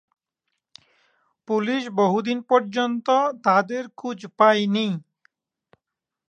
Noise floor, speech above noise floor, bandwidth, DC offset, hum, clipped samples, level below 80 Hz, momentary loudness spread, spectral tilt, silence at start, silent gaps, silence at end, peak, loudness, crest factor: -85 dBFS; 64 dB; 8.8 kHz; under 0.1%; none; under 0.1%; -78 dBFS; 12 LU; -5.5 dB/octave; 1.5 s; none; 1.3 s; -2 dBFS; -22 LUFS; 22 dB